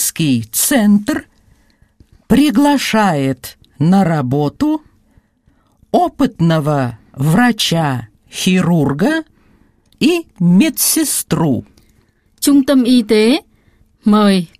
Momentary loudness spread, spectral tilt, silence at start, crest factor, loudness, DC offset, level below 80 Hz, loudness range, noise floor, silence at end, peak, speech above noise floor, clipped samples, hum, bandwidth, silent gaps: 9 LU; -5 dB/octave; 0 s; 14 dB; -14 LUFS; under 0.1%; -46 dBFS; 3 LU; -56 dBFS; 0.15 s; 0 dBFS; 43 dB; under 0.1%; none; 15.5 kHz; none